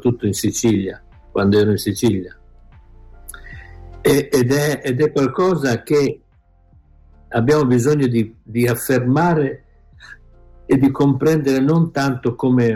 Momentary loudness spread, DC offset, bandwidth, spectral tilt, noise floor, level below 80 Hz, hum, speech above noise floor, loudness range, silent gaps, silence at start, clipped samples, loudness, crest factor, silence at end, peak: 11 LU; under 0.1%; 16.5 kHz; -6.5 dB/octave; -53 dBFS; -46 dBFS; none; 37 dB; 3 LU; none; 0 s; under 0.1%; -17 LUFS; 12 dB; 0 s; -6 dBFS